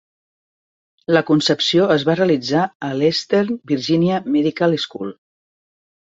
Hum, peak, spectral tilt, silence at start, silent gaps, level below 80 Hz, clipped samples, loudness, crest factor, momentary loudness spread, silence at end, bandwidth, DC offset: none; -2 dBFS; -5.5 dB/octave; 1.1 s; 2.75-2.80 s; -62 dBFS; under 0.1%; -18 LUFS; 18 dB; 7 LU; 1 s; 7.8 kHz; under 0.1%